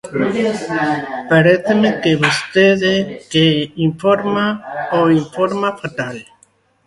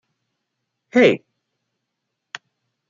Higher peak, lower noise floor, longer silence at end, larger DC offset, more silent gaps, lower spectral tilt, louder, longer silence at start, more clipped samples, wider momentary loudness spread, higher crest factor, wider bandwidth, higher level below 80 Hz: about the same, 0 dBFS vs -2 dBFS; second, -55 dBFS vs -79 dBFS; second, 0.65 s vs 1.7 s; neither; neither; about the same, -5.5 dB/octave vs -5.5 dB/octave; about the same, -15 LUFS vs -17 LUFS; second, 0.05 s vs 0.95 s; neither; second, 10 LU vs 22 LU; second, 16 dB vs 22 dB; first, 11.5 kHz vs 7.4 kHz; first, -54 dBFS vs -72 dBFS